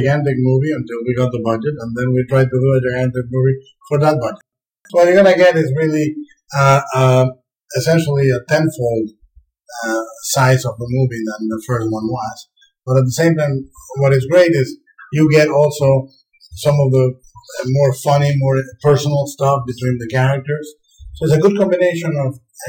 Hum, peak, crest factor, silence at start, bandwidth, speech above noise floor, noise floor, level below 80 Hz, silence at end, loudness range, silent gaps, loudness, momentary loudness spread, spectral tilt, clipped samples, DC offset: none; -2 dBFS; 14 dB; 0 s; 18 kHz; 36 dB; -51 dBFS; -50 dBFS; 0 s; 5 LU; none; -16 LUFS; 12 LU; -6.5 dB/octave; under 0.1%; under 0.1%